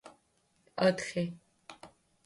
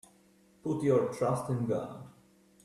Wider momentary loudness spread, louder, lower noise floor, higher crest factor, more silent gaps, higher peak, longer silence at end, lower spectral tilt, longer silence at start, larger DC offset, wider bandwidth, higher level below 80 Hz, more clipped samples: first, 24 LU vs 14 LU; about the same, -32 LUFS vs -31 LUFS; first, -73 dBFS vs -64 dBFS; about the same, 22 dB vs 18 dB; neither; about the same, -14 dBFS vs -16 dBFS; second, 0.4 s vs 0.55 s; second, -5.5 dB/octave vs -8 dB/octave; second, 0.05 s vs 0.65 s; neither; second, 11.5 kHz vs 13 kHz; about the same, -74 dBFS vs -70 dBFS; neither